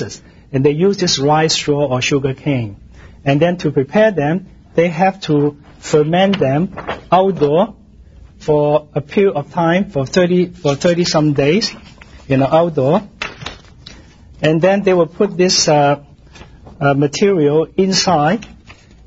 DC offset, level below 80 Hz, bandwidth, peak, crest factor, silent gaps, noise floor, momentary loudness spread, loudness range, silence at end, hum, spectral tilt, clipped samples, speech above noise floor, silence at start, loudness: under 0.1%; -44 dBFS; 8 kHz; 0 dBFS; 16 dB; none; -41 dBFS; 9 LU; 2 LU; 0.35 s; none; -5 dB/octave; under 0.1%; 28 dB; 0 s; -15 LUFS